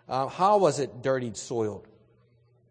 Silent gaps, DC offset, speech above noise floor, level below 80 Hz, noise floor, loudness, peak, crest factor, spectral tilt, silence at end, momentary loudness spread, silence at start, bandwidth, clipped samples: none; under 0.1%; 37 dB; -68 dBFS; -63 dBFS; -26 LUFS; -8 dBFS; 20 dB; -5 dB/octave; 0.9 s; 11 LU; 0.1 s; 9.8 kHz; under 0.1%